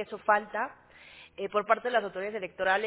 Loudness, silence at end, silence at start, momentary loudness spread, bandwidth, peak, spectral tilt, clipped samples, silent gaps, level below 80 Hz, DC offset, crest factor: -30 LUFS; 0 s; 0 s; 12 LU; 4 kHz; -8 dBFS; -1 dB/octave; under 0.1%; none; -70 dBFS; under 0.1%; 22 dB